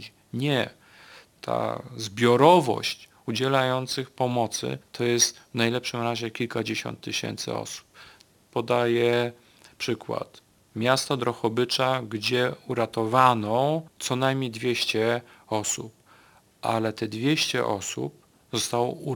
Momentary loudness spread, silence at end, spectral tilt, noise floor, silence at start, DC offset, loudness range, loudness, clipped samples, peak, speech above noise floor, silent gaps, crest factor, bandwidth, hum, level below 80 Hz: 12 LU; 0 s; -4 dB/octave; -57 dBFS; 0 s; under 0.1%; 5 LU; -26 LUFS; under 0.1%; -2 dBFS; 32 dB; none; 24 dB; 19 kHz; none; -68 dBFS